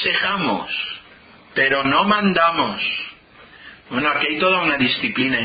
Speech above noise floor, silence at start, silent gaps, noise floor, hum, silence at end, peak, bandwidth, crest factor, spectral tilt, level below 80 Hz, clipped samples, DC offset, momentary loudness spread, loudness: 28 dB; 0 s; none; -46 dBFS; none; 0 s; -4 dBFS; 5 kHz; 16 dB; -9.5 dB/octave; -54 dBFS; under 0.1%; under 0.1%; 11 LU; -18 LUFS